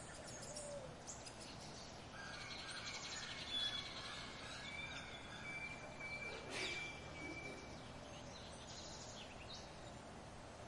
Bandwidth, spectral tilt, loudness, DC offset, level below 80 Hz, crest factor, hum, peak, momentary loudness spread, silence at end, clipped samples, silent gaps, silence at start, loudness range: 11.5 kHz; -2.5 dB/octave; -48 LUFS; under 0.1%; -66 dBFS; 18 dB; none; -32 dBFS; 10 LU; 0 s; under 0.1%; none; 0 s; 5 LU